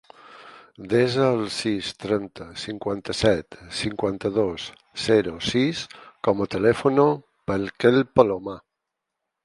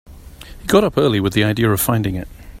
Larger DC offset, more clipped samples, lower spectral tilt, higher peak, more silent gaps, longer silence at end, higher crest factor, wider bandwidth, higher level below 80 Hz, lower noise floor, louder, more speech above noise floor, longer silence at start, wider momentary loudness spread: neither; neither; about the same, -5.5 dB/octave vs -5.5 dB/octave; about the same, 0 dBFS vs 0 dBFS; neither; first, 0.85 s vs 0.05 s; about the same, 22 dB vs 18 dB; second, 11.5 kHz vs 16 kHz; second, -52 dBFS vs -38 dBFS; first, -83 dBFS vs -37 dBFS; second, -23 LUFS vs -17 LUFS; first, 60 dB vs 21 dB; first, 0.3 s vs 0.1 s; about the same, 14 LU vs 14 LU